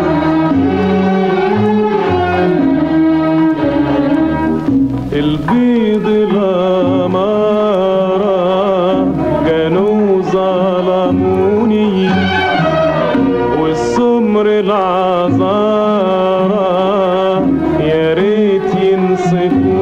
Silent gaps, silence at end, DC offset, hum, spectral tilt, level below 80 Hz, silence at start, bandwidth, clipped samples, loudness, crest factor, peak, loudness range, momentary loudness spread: none; 0 s; under 0.1%; none; -7.5 dB/octave; -38 dBFS; 0 s; 8.6 kHz; under 0.1%; -12 LUFS; 8 dB; -4 dBFS; 1 LU; 2 LU